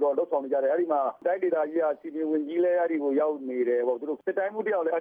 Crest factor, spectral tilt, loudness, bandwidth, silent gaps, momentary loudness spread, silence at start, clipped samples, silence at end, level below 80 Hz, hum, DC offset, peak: 12 dB; -8.5 dB/octave; -27 LUFS; 3.6 kHz; none; 4 LU; 0 s; under 0.1%; 0 s; -86 dBFS; none; under 0.1%; -14 dBFS